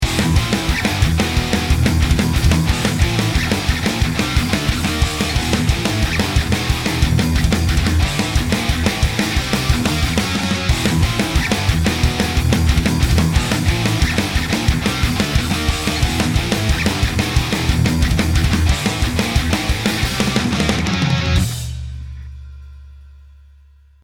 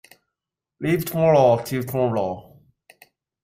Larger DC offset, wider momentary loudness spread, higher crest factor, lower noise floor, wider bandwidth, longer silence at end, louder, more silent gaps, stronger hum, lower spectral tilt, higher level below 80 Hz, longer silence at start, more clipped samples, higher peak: neither; second, 2 LU vs 13 LU; about the same, 16 dB vs 18 dB; second, -47 dBFS vs -86 dBFS; about the same, 17.5 kHz vs 16 kHz; second, 0.9 s vs 1.05 s; first, -17 LUFS vs -21 LUFS; neither; neither; second, -4.5 dB/octave vs -7 dB/octave; first, -22 dBFS vs -58 dBFS; second, 0 s vs 0.8 s; neither; first, 0 dBFS vs -6 dBFS